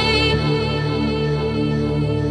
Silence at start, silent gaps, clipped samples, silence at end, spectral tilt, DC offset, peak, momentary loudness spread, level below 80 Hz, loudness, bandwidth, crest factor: 0 s; none; under 0.1%; 0 s; -6.5 dB/octave; under 0.1%; -4 dBFS; 4 LU; -32 dBFS; -20 LUFS; 10 kHz; 14 dB